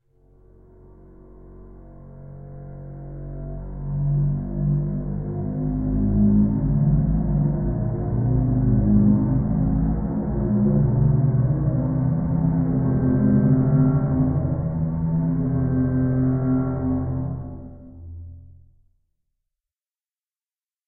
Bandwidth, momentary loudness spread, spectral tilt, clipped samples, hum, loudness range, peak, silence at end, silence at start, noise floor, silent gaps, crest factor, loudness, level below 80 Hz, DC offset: 2.2 kHz; 19 LU; -16.5 dB/octave; under 0.1%; none; 11 LU; -6 dBFS; 2.4 s; 1.35 s; under -90 dBFS; none; 16 dB; -21 LUFS; -32 dBFS; under 0.1%